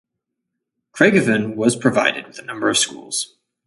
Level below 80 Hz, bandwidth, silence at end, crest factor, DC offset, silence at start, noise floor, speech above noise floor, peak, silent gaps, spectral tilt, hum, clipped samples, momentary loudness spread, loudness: -62 dBFS; 11.5 kHz; 0.4 s; 20 dB; under 0.1%; 0.95 s; -79 dBFS; 61 dB; 0 dBFS; none; -3.5 dB/octave; none; under 0.1%; 13 LU; -18 LUFS